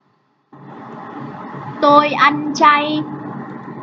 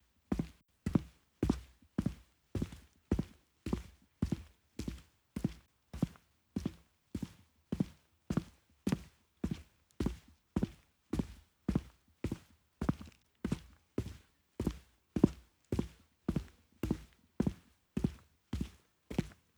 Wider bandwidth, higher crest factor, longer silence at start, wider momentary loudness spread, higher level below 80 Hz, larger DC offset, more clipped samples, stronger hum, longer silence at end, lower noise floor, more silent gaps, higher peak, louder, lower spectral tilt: second, 7.6 kHz vs over 20 kHz; second, 18 dB vs 30 dB; first, 0.55 s vs 0.3 s; first, 21 LU vs 17 LU; second, -64 dBFS vs -50 dBFS; neither; neither; neither; second, 0 s vs 0.25 s; about the same, -61 dBFS vs -61 dBFS; neither; first, 0 dBFS vs -10 dBFS; first, -13 LUFS vs -41 LUFS; second, -4.5 dB/octave vs -7.5 dB/octave